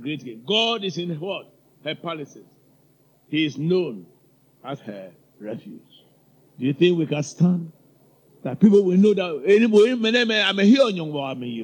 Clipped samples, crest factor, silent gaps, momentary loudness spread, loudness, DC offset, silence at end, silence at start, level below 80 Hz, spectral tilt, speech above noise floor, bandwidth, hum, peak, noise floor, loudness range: under 0.1%; 18 dB; none; 20 LU; -20 LUFS; under 0.1%; 0 s; 0 s; -72 dBFS; -6 dB/octave; 38 dB; 18 kHz; none; -4 dBFS; -59 dBFS; 11 LU